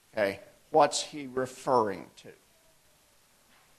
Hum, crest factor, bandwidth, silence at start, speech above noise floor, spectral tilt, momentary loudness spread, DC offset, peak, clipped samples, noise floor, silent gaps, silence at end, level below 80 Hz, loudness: none; 22 dB; 13 kHz; 0.15 s; 35 dB; -3.5 dB/octave; 17 LU; under 0.1%; -10 dBFS; under 0.1%; -64 dBFS; none; 1.5 s; -72 dBFS; -29 LUFS